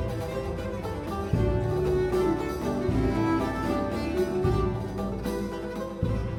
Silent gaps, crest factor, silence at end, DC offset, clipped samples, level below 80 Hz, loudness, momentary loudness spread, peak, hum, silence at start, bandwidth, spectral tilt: none; 16 dB; 0 s; under 0.1%; under 0.1%; -36 dBFS; -28 LUFS; 7 LU; -12 dBFS; none; 0 s; 17.5 kHz; -7.5 dB/octave